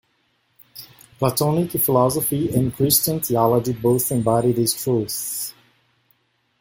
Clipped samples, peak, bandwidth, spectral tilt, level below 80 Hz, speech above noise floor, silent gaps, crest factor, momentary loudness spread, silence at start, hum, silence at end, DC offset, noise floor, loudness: under 0.1%; -4 dBFS; 17 kHz; -5.5 dB/octave; -52 dBFS; 47 dB; none; 18 dB; 9 LU; 0.75 s; none; 1.1 s; under 0.1%; -66 dBFS; -20 LUFS